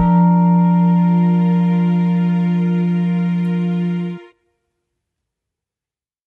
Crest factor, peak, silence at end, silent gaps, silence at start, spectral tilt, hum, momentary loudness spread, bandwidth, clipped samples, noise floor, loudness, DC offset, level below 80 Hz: 12 dB; -4 dBFS; 2.05 s; none; 0 s; -10.5 dB/octave; none; 7 LU; 3.7 kHz; under 0.1%; under -90 dBFS; -15 LUFS; under 0.1%; -48 dBFS